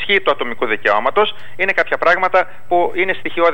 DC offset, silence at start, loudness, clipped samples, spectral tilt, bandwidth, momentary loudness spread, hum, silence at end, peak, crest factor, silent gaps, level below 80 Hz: 6%; 0 s; -16 LUFS; under 0.1%; -5 dB/octave; 16.5 kHz; 5 LU; none; 0 s; -2 dBFS; 14 dB; none; -54 dBFS